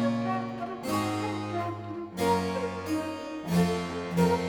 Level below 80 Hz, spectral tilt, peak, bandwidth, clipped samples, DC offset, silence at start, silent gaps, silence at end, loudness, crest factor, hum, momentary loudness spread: -58 dBFS; -6 dB/octave; -12 dBFS; 19.5 kHz; under 0.1%; under 0.1%; 0 s; none; 0 s; -30 LUFS; 16 dB; none; 9 LU